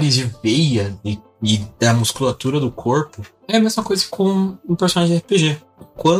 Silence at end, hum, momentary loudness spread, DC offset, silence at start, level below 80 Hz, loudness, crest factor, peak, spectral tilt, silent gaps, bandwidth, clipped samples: 0 s; none; 7 LU; under 0.1%; 0 s; -50 dBFS; -18 LUFS; 18 dB; 0 dBFS; -5 dB/octave; none; 15.5 kHz; under 0.1%